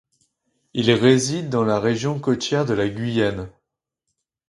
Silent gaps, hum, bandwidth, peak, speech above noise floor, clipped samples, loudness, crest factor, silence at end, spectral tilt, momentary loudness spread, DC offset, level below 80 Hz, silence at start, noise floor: none; none; 11.5 kHz; -2 dBFS; 60 dB; under 0.1%; -20 LUFS; 20 dB; 1 s; -5.5 dB/octave; 8 LU; under 0.1%; -52 dBFS; 0.75 s; -80 dBFS